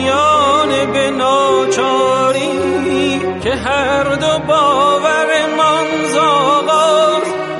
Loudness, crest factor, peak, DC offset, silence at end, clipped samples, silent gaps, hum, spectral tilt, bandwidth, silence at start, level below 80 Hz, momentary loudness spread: -13 LUFS; 10 dB; -2 dBFS; under 0.1%; 0 s; under 0.1%; none; none; -3.5 dB/octave; 11.5 kHz; 0 s; -44 dBFS; 5 LU